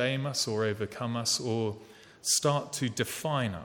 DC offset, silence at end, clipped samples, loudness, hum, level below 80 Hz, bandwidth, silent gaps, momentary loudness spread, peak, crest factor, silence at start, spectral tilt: under 0.1%; 0 s; under 0.1%; -30 LUFS; none; -66 dBFS; 19 kHz; none; 8 LU; -14 dBFS; 18 dB; 0 s; -3.5 dB/octave